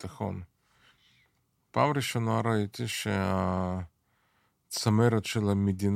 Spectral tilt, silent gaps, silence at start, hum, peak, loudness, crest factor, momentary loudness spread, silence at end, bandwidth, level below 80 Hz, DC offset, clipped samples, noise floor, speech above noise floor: -6 dB/octave; none; 0 s; none; -10 dBFS; -29 LUFS; 20 dB; 12 LU; 0 s; 15.5 kHz; -62 dBFS; under 0.1%; under 0.1%; -73 dBFS; 45 dB